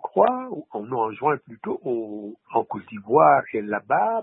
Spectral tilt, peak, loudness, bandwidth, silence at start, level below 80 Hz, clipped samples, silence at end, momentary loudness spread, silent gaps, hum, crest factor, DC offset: -11 dB/octave; -4 dBFS; -23 LUFS; 4 kHz; 0 s; -70 dBFS; under 0.1%; 0 s; 15 LU; none; none; 20 dB; under 0.1%